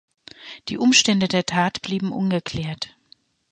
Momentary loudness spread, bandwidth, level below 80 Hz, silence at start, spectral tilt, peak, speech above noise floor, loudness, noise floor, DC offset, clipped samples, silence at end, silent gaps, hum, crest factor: 18 LU; 9.8 kHz; -56 dBFS; 0.4 s; -3.5 dB/octave; -2 dBFS; 36 dB; -20 LUFS; -57 dBFS; under 0.1%; under 0.1%; 0.65 s; none; none; 20 dB